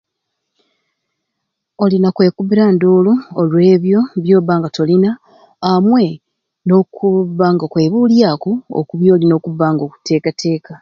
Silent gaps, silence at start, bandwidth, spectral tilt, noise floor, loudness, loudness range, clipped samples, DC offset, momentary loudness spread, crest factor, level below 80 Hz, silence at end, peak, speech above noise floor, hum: none; 1.8 s; 7.2 kHz; -8 dB/octave; -75 dBFS; -13 LUFS; 2 LU; under 0.1%; under 0.1%; 8 LU; 14 dB; -58 dBFS; 0.05 s; 0 dBFS; 63 dB; none